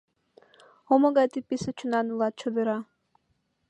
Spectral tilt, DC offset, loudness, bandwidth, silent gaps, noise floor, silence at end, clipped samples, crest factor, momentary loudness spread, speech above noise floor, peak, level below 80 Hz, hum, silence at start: -6 dB/octave; under 0.1%; -26 LUFS; 9.2 kHz; none; -74 dBFS; 0.85 s; under 0.1%; 20 dB; 10 LU; 48 dB; -8 dBFS; -68 dBFS; none; 0.9 s